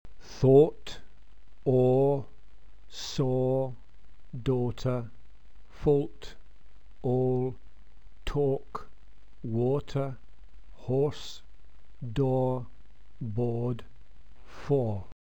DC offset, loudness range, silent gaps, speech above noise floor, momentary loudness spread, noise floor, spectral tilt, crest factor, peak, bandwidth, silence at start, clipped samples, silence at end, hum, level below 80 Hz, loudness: 1%; 5 LU; none; 28 dB; 22 LU; -55 dBFS; -8 dB/octave; 20 dB; -10 dBFS; 8.4 kHz; 0.05 s; under 0.1%; 0.15 s; none; -50 dBFS; -29 LUFS